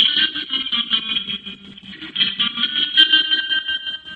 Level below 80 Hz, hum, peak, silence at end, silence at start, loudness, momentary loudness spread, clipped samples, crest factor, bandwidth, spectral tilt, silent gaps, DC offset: -60 dBFS; none; 0 dBFS; 0 s; 0 s; -17 LUFS; 18 LU; under 0.1%; 20 dB; 10 kHz; -2.5 dB/octave; none; under 0.1%